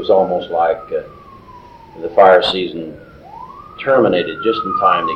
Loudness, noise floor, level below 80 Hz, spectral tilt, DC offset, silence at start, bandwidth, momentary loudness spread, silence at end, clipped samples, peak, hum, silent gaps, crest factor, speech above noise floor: -15 LUFS; -39 dBFS; -50 dBFS; -6 dB/octave; under 0.1%; 0 s; 8.8 kHz; 23 LU; 0 s; under 0.1%; 0 dBFS; none; none; 16 dB; 25 dB